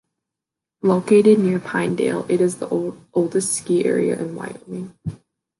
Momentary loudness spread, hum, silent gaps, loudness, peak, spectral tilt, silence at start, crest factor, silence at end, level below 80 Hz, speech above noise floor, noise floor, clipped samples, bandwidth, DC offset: 18 LU; none; none; -19 LUFS; -4 dBFS; -6 dB/octave; 0.85 s; 16 dB; 0.45 s; -60 dBFS; 67 dB; -86 dBFS; under 0.1%; 11.5 kHz; under 0.1%